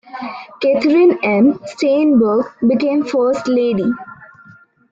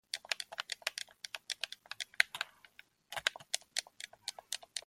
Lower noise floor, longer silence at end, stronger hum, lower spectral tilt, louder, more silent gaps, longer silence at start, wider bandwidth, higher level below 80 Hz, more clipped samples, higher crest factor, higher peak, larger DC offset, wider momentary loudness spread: second, -46 dBFS vs -63 dBFS; first, 0.65 s vs 0.05 s; neither; first, -6.5 dB/octave vs 2.5 dB/octave; first, -15 LUFS vs -39 LUFS; neither; about the same, 0.15 s vs 0.15 s; second, 7.8 kHz vs 16.5 kHz; first, -58 dBFS vs -82 dBFS; neither; second, 12 dB vs 36 dB; about the same, -4 dBFS vs -4 dBFS; neither; about the same, 10 LU vs 12 LU